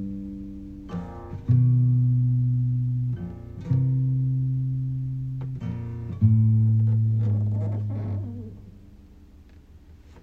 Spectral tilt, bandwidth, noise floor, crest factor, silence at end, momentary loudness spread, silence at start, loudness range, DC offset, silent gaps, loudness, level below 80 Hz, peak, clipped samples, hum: -11.5 dB/octave; 2.4 kHz; -49 dBFS; 16 dB; 0.05 s; 16 LU; 0 s; 4 LU; under 0.1%; none; -24 LUFS; -48 dBFS; -8 dBFS; under 0.1%; none